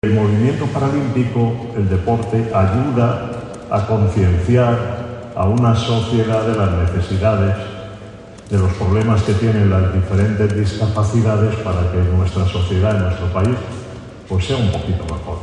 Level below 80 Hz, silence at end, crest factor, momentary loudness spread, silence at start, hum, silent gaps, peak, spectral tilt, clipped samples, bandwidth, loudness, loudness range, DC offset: -28 dBFS; 0 s; 14 dB; 10 LU; 0.05 s; none; none; -2 dBFS; -7.5 dB/octave; under 0.1%; 9.8 kHz; -17 LUFS; 2 LU; under 0.1%